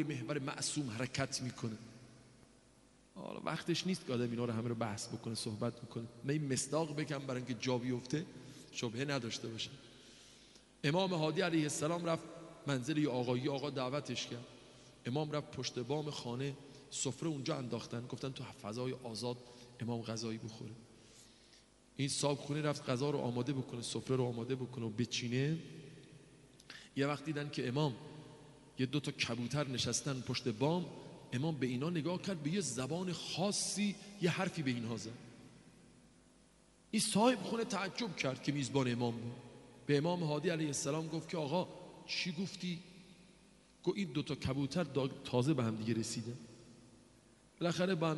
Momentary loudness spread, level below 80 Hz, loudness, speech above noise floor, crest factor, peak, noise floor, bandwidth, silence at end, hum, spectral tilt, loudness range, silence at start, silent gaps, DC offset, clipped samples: 17 LU; -72 dBFS; -38 LUFS; 29 dB; 22 dB; -18 dBFS; -66 dBFS; 11.5 kHz; 0 s; none; -5 dB/octave; 5 LU; 0 s; none; under 0.1%; under 0.1%